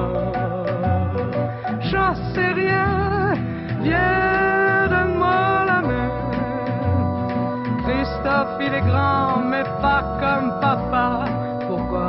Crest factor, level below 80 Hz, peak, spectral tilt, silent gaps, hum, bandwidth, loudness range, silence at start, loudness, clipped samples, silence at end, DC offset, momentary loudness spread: 14 dB; -38 dBFS; -6 dBFS; -10 dB/octave; none; none; 5.8 kHz; 3 LU; 0 s; -20 LUFS; under 0.1%; 0 s; under 0.1%; 6 LU